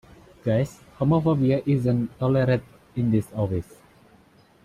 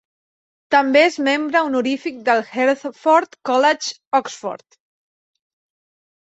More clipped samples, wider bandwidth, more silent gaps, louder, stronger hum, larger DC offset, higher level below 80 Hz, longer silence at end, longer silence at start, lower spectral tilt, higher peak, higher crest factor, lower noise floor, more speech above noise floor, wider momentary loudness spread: neither; first, 13 kHz vs 8.2 kHz; second, none vs 4.07-4.11 s; second, -24 LUFS vs -18 LUFS; neither; neither; first, -52 dBFS vs -70 dBFS; second, 1.05 s vs 1.65 s; second, 0.45 s vs 0.7 s; first, -9 dB/octave vs -2.5 dB/octave; second, -10 dBFS vs -2 dBFS; about the same, 14 dB vs 18 dB; second, -56 dBFS vs under -90 dBFS; second, 33 dB vs over 72 dB; about the same, 10 LU vs 9 LU